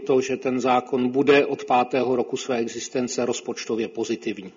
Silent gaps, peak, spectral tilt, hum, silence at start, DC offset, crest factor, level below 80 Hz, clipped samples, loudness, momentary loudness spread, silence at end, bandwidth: none; -6 dBFS; -4.5 dB/octave; none; 0 s; under 0.1%; 18 dB; -66 dBFS; under 0.1%; -23 LUFS; 9 LU; 0.05 s; 7.6 kHz